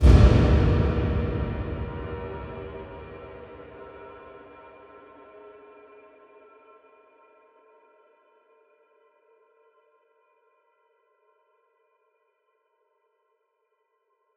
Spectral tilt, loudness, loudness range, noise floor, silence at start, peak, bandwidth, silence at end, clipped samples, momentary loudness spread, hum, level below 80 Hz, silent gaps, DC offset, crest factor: -8.5 dB/octave; -24 LUFS; 27 LU; -74 dBFS; 0 s; -2 dBFS; 7.4 kHz; 10.25 s; under 0.1%; 29 LU; none; -30 dBFS; none; under 0.1%; 24 dB